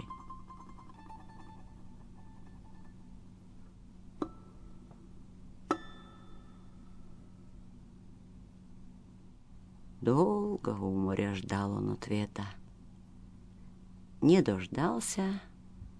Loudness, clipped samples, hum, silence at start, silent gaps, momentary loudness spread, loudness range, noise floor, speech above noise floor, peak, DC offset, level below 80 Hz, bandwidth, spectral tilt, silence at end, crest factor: -33 LUFS; under 0.1%; none; 0 s; none; 26 LU; 22 LU; -54 dBFS; 23 dB; -14 dBFS; under 0.1%; -56 dBFS; 11 kHz; -6.5 dB/octave; 0 s; 22 dB